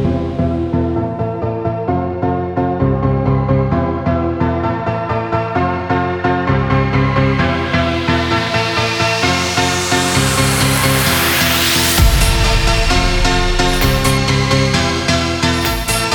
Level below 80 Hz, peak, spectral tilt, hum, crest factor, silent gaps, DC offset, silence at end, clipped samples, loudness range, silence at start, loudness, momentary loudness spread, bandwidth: -22 dBFS; 0 dBFS; -4.5 dB/octave; none; 14 dB; none; under 0.1%; 0 s; under 0.1%; 4 LU; 0 s; -15 LUFS; 6 LU; over 20 kHz